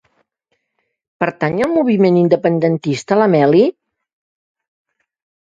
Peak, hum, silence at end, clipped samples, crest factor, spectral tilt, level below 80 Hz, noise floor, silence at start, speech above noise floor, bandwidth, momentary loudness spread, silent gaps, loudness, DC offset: 0 dBFS; none; 1.7 s; under 0.1%; 16 dB; -7.5 dB/octave; -60 dBFS; -71 dBFS; 1.2 s; 57 dB; 9.2 kHz; 7 LU; none; -14 LUFS; under 0.1%